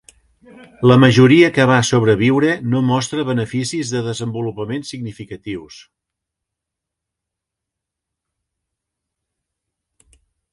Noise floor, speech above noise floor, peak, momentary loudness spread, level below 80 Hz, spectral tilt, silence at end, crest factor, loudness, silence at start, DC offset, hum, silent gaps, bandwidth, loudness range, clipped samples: -83 dBFS; 67 dB; 0 dBFS; 19 LU; -54 dBFS; -6 dB/octave; 4.8 s; 18 dB; -15 LUFS; 0.8 s; under 0.1%; none; none; 11.5 kHz; 21 LU; under 0.1%